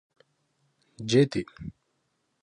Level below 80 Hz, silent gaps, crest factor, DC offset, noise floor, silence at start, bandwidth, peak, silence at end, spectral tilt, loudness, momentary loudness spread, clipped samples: -60 dBFS; none; 20 dB; under 0.1%; -75 dBFS; 1 s; 10.5 kHz; -10 dBFS; 0.7 s; -6 dB/octave; -25 LUFS; 21 LU; under 0.1%